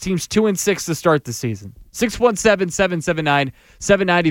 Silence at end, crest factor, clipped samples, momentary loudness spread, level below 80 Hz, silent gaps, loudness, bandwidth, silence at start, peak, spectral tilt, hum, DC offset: 0 s; 16 dB; under 0.1%; 11 LU; -44 dBFS; none; -18 LUFS; 17 kHz; 0 s; -2 dBFS; -4.5 dB/octave; none; under 0.1%